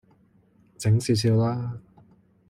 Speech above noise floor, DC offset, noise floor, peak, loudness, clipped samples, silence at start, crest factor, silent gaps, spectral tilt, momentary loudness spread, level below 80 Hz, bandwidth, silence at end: 38 dB; under 0.1%; -60 dBFS; -12 dBFS; -24 LUFS; under 0.1%; 0.8 s; 14 dB; none; -6.5 dB/octave; 13 LU; -58 dBFS; 14 kHz; 0.7 s